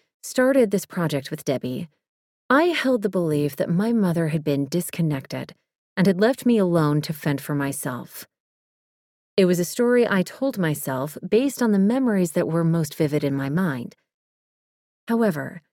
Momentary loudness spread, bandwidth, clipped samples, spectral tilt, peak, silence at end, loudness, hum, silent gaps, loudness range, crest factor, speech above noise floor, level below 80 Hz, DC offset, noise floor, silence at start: 11 LU; 18.5 kHz; under 0.1%; -6 dB/octave; -4 dBFS; 0.15 s; -22 LUFS; none; 2.08-2.49 s, 5.78-5.96 s, 8.40-9.37 s, 14.14-15.07 s; 3 LU; 18 dB; over 68 dB; -64 dBFS; under 0.1%; under -90 dBFS; 0.25 s